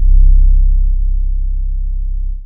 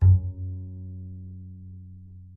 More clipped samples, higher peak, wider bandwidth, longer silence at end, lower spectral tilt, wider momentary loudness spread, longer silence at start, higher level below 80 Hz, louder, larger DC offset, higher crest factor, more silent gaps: neither; first, 0 dBFS vs -8 dBFS; second, 0.2 kHz vs 1.1 kHz; second, 0 s vs 0.15 s; first, -26 dB/octave vs -13.5 dB/octave; second, 10 LU vs 21 LU; about the same, 0 s vs 0 s; first, -10 dBFS vs -44 dBFS; first, -17 LUFS vs -29 LUFS; neither; second, 10 dB vs 18 dB; neither